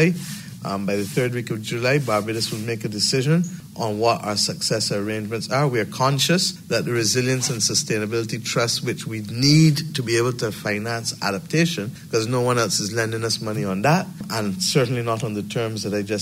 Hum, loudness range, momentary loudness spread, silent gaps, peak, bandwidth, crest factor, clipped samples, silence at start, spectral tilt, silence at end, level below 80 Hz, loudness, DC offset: none; 2 LU; 8 LU; none; -4 dBFS; 16 kHz; 16 dB; under 0.1%; 0 s; -4.5 dB/octave; 0 s; -58 dBFS; -22 LUFS; under 0.1%